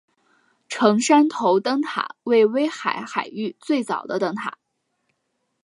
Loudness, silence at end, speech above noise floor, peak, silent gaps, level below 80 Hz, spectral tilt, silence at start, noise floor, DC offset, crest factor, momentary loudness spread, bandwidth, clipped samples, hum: -21 LUFS; 1.15 s; 53 dB; -2 dBFS; none; -76 dBFS; -4.5 dB/octave; 0.7 s; -74 dBFS; under 0.1%; 20 dB; 13 LU; 11.5 kHz; under 0.1%; none